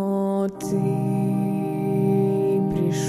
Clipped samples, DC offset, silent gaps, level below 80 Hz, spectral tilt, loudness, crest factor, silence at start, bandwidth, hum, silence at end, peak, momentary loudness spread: under 0.1%; under 0.1%; none; -52 dBFS; -8 dB/octave; -23 LUFS; 12 dB; 0 s; 14 kHz; none; 0 s; -10 dBFS; 4 LU